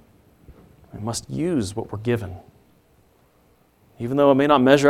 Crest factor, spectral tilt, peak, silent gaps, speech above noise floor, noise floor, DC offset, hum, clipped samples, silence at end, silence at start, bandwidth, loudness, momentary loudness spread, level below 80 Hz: 22 dB; -5.5 dB/octave; -2 dBFS; none; 39 dB; -59 dBFS; under 0.1%; none; under 0.1%; 0 s; 0.5 s; 14.5 kHz; -21 LUFS; 19 LU; -54 dBFS